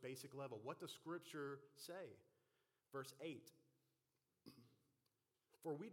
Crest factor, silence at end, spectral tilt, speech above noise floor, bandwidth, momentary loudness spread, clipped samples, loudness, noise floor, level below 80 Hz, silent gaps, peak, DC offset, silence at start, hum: 20 dB; 0 s; -5 dB/octave; 36 dB; 16.5 kHz; 15 LU; under 0.1%; -54 LUFS; -90 dBFS; under -90 dBFS; none; -36 dBFS; under 0.1%; 0 s; none